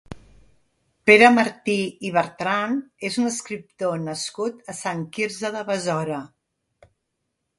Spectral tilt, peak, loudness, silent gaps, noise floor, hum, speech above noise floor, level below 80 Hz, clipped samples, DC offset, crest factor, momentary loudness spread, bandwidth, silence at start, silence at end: -4 dB/octave; 0 dBFS; -22 LUFS; none; -77 dBFS; none; 55 dB; -60 dBFS; under 0.1%; under 0.1%; 24 dB; 15 LU; 11.5 kHz; 0.1 s; 1.35 s